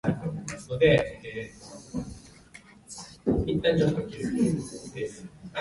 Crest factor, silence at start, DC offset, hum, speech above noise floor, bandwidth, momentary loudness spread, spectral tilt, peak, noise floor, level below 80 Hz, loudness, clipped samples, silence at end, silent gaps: 20 dB; 0.05 s; under 0.1%; none; 26 dB; 11.5 kHz; 20 LU; -6 dB/octave; -8 dBFS; -52 dBFS; -46 dBFS; -28 LUFS; under 0.1%; 0 s; none